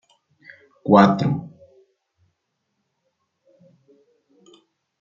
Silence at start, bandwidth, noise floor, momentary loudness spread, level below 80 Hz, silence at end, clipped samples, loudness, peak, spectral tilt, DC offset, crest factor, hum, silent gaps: 0.85 s; 7.2 kHz; -75 dBFS; 20 LU; -64 dBFS; 3.55 s; under 0.1%; -18 LUFS; -2 dBFS; -8 dB/octave; under 0.1%; 22 dB; none; none